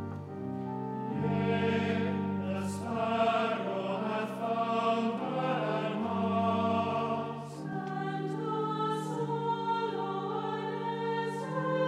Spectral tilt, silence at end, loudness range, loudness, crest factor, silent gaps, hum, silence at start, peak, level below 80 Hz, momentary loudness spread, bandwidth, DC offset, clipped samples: -7 dB/octave; 0 s; 2 LU; -32 LUFS; 16 dB; none; none; 0 s; -16 dBFS; -78 dBFS; 7 LU; 12.5 kHz; under 0.1%; under 0.1%